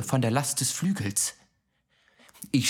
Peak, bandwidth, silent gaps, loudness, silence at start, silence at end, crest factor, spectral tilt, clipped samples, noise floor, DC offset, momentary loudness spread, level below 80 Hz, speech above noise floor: -10 dBFS; 19.5 kHz; none; -27 LUFS; 0 s; 0 s; 20 dB; -4 dB/octave; under 0.1%; -72 dBFS; under 0.1%; 5 LU; -68 dBFS; 45 dB